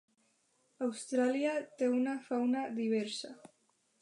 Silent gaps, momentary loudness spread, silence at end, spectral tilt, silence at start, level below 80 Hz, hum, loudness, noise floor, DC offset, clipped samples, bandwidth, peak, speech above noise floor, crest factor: none; 8 LU; 0.65 s; -4.5 dB/octave; 0.8 s; under -90 dBFS; none; -34 LUFS; -75 dBFS; under 0.1%; under 0.1%; 11 kHz; -20 dBFS; 41 dB; 16 dB